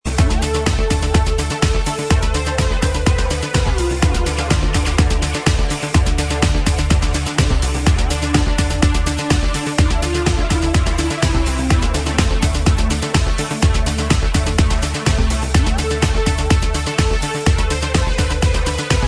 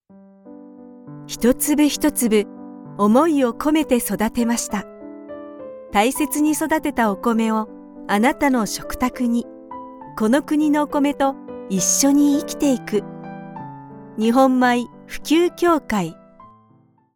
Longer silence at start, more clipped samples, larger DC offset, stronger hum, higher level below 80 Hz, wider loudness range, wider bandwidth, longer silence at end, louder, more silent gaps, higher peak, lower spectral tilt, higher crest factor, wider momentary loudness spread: second, 0.05 s vs 0.45 s; neither; neither; neither; first, -18 dBFS vs -48 dBFS; about the same, 1 LU vs 3 LU; second, 11 kHz vs 18 kHz; second, 0 s vs 1.05 s; about the same, -17 LUFS vs -19 LUFS; neither; first, 0 dBFS vs -4 dBFS; about the same, -5 dB/octave vs -4 dB/octave; about the same, 16 dB vs 16 dB; second, 2 LU vs 20 LU